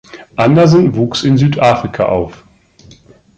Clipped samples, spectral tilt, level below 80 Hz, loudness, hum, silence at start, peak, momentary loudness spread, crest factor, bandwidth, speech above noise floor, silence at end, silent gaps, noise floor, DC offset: under 0.1%; -7 dB/octave; -42 dBFS; -11 LUFS; none; 0.15 s; 0 dBFS; 9 LU; 12 dB; 8.6 kHz; 32 dB; 1 s; none; -43 dBFS; under 0.1%